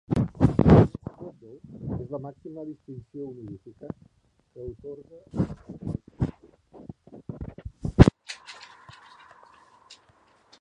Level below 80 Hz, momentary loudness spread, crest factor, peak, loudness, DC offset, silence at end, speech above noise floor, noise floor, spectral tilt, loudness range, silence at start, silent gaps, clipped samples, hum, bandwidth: -38 dBFS; 26 LU; 26 dB; 0 dBFS; -24 LUFS; under 0.1%; 2.1 s; 25 dB; -61 dBFS; -8.5 dB/octave; 14 LU; 0.1 s; none; under 0.1%; none; 10 kHz